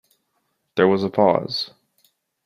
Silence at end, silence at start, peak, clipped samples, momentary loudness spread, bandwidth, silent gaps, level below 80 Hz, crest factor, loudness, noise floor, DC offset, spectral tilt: 0.8 s; 0.75 s; -2 dBFS; under 0.1%; 11 LU; 14 kHz; none; -64 dBFS; 20 dB; -20 LUFS; -72 dBFS; under 0.1%; -7 dB/octave